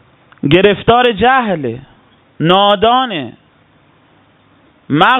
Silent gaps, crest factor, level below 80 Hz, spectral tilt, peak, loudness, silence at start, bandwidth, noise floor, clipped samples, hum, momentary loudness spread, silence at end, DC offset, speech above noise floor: none; 14 dB; -44 dBFS; -7.5 dB/octave; 0 dBFS; -12 LUFS; 0.45 s; 5.8 kHz; -50 dBFS; under 0.1%; none; 13 LU; 0 s; under 0.1%; 39 dB